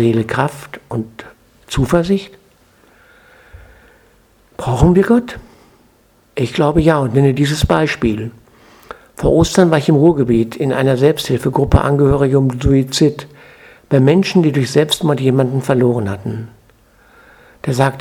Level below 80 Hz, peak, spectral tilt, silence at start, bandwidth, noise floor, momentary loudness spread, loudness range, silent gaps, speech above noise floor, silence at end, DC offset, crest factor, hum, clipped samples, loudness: -32 dBFS; 0 dBFS; -6.5 dB/octave; 0 s; 16 kHz; -53 dBFS; 14 LU; 7 LU; none; 39 dB; 0 s; under 0.1%; 16 dB; none; under 0.1%; -14 LUFS